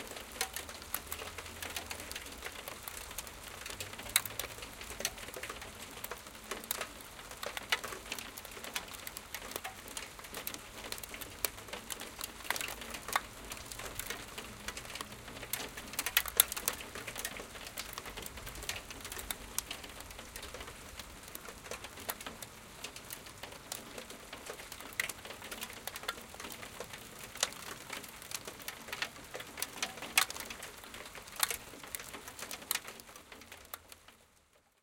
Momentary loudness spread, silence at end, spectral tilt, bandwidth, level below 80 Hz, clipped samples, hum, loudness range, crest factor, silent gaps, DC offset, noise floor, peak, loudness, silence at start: 12 LU; 0.25 s; -1 dB/octave; 17 kHz; -60 dBFS; under 0.1%; none; 9 LU; 40 dB; none; under 0.1%; -68 dBFS; -2 dBFS; -40 LUFS; 0 s